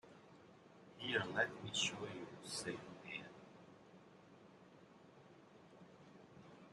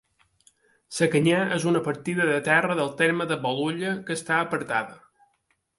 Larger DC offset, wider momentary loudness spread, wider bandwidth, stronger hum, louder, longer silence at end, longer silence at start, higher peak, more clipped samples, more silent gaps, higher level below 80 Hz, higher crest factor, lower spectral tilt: neither; first, 24 LU vs 7 LU; about the same, 12 kHz vs 11.5 kHz; neither; second, -43 LUFS vs -24 LUFS; second, 0 s vs 0.8 s; second, 0.05 s vs 0.9 s; second, -22 dBFS vs -6 dBFS; neither; neither; second, -82 dBFS vs -68 dBFS; first, 26 dB vs 20 dB; second, -2.5 dB/octave vs -5 dB/octave